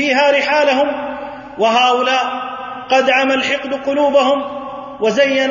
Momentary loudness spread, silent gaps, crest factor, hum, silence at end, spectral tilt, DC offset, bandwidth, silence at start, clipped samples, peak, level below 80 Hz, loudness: 13 LU; none; 14 dB; none; 0 s; -3 dB/octave; under 0.1%; 7.4 kHz; 0 s; under 0.1%; -2 dBFS; -56 dBFS; -14 LUFS